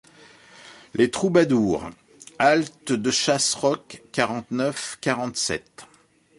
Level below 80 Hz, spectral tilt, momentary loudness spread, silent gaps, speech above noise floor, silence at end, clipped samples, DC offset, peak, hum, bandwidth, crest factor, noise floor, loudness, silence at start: -58 dBFS; -3.5 dB/octave; 10 LU; none; 28 dB; 0.55 s; under 0.1%; under 0.1%; -6 dBFS; none; 11.5 kHz; 18 dB; -51 dBFS; -23 LUFS; 0.65 s